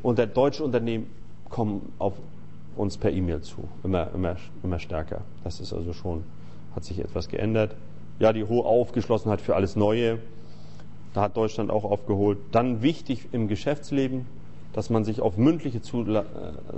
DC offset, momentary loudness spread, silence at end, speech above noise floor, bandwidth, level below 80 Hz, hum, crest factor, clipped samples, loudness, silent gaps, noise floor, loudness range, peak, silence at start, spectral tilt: 2%; 17 LU; 0 s; 19 dB; 8.4 kHz; -46 dBFS; none; 18 dB; under 0.1%; -27 LUFS; none; -45 dBFS; 7 LU; -8 dBFS; 0 s; -7.5 dB/octave